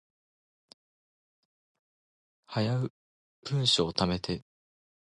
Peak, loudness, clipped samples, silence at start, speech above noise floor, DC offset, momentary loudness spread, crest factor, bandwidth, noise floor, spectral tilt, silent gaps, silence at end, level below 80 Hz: -10 dBFS; -30 LUFS; under 0.1%; 2.5 s; over 61 dB; under 0.1%; 13 LU; 24 dB; 11.5 kHz; under -90 dBFS; -5 dB/octave; 2.90-3.43 s; 0.65 s; -58 dBFS